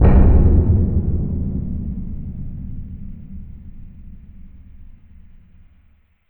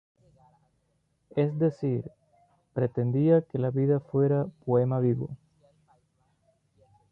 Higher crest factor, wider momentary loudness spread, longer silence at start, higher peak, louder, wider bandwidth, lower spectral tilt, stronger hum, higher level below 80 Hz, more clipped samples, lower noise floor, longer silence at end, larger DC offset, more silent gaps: about the same, 16 dB vs 18 dB; first, 26 LU vs 11 LU; second, 0 s vs 1.35 s; first, -2 dBFS vs -10 dBFS; first, -19 LUFS vs -27 LUFS; second, 3 kHz vs 5 kHz; first, -14.5 dB/octave vs -11.5 dB/octave; neither; first, -20 dBFS vs -66 dBFS; neither; second, -54 dBFS vs -73 dBFS; second, 1.45 s vs 1.75 s; neither; neither